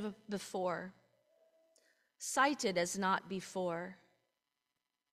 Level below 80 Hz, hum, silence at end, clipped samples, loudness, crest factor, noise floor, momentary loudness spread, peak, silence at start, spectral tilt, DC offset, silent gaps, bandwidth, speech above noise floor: -80 dBFS; none; 1.2 s; under 0.1%; -37 LUFS; 22 dB; -89 dBFS; 12 LU; -18 dBFS; 0 s; -3.5 dB/octave; under 0.1%; none; 15.5 kHz; 52 dB